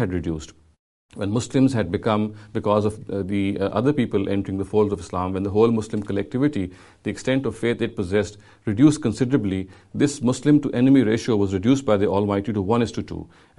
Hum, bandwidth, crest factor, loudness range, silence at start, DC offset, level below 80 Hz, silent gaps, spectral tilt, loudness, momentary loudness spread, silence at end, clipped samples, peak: none; 11.5 kHz; 18 dB; 4 LU; 0 s; under 0.1%; -50 dBFS; 0.79-1.09 s; -7 dB/octave; -22 LUFS; 12 LU; 0.3 s; under 0.1%; -2 dBFS